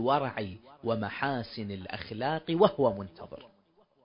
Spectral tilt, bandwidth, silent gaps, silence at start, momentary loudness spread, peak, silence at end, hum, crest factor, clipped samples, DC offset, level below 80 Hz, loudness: -10 dB/octave; 5.4 kHz; none; 0 s; 17 LU; -8 dBFS; 0.6 s; none; 24 dB; under 0.1%; under 0.1%; -60 dBFS; -31 LUFS